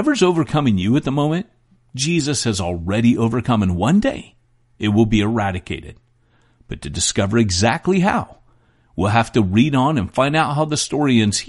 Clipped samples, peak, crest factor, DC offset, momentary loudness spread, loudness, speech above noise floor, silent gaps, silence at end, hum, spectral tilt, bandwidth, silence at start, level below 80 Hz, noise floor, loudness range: under 0.1%; -2 dBFS; 16 dB; under 0.1%; 12 LU; -18 LUFS; 40 dB; none; 0 s; none; -5 dB/octave; 11.5 kHz; 0 s; -42 dBFS; -57 dBFS; 3 LU